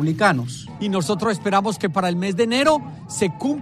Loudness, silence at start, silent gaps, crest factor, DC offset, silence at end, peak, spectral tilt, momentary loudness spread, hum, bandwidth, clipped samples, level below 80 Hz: -21 LUFS; 0 s; none; 16 dB; under 0.1%; 0 s; -4 dBFS; -5 dB/octave; 7 LU; none; 14.5 kHz; under 0.1%; -56 dBFS